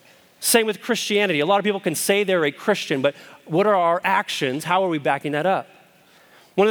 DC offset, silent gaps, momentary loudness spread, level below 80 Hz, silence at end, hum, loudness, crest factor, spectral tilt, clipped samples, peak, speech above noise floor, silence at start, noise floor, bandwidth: under 0.1%; none; 6 LU; -78 dBFS; 0 s; none; -21 LUFS; 20 dB; -3.5 dB/octave; under 0.1%; -2 dBFS; 32 dB; 0.4 s; -53 dBFS; over 20 kHz